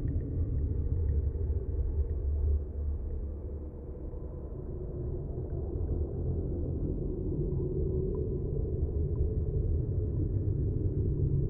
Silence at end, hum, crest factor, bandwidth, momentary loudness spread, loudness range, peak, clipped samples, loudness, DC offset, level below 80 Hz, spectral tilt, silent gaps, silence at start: 0 s; none; 12 dB; 1.9 kHz; 9 LU; 5 LU; -18 dBFS; under 0.1%; -34 LUFS; under 0.1%; -36 dBFS; -15.5 dB/octave; none; 0 s